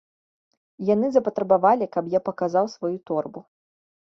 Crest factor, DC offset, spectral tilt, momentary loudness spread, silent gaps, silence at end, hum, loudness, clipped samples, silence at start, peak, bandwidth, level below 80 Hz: 20 dB; under 0.1%; -7.5 dB/octave; 10 LU; none; 0.75 s; none; -23 LUFS; under 0.1%; 0.8 s; -4 dBFS; 7.2 kHz; -68 dBFS